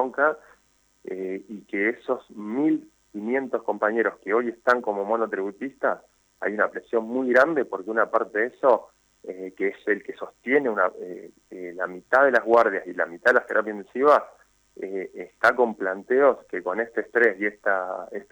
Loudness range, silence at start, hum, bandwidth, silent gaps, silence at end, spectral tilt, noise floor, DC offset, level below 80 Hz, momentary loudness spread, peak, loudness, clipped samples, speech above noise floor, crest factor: 5 LU; 0 s; none; over 20 kHz; none; 0.1 s; -6 dB/octave; -64 dBFS; under 0.1%; -70 dBFS; 17 LU; -6 dBFS; -24 LUFS; under 0.1%; 40 dB; 18 dB